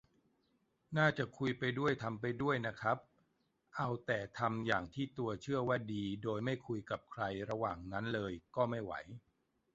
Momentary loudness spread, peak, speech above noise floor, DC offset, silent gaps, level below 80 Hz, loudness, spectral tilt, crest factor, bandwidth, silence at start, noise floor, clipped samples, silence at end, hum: 7 LU; -18 dBFS; 41 dB; under 0.1%; none; -66 dBFS; -38 LUFS; -5 dB/octave; 22 dB; 8 kHz; 0.9 s; -79 dBFS; under 0.1%; 0.55 s; none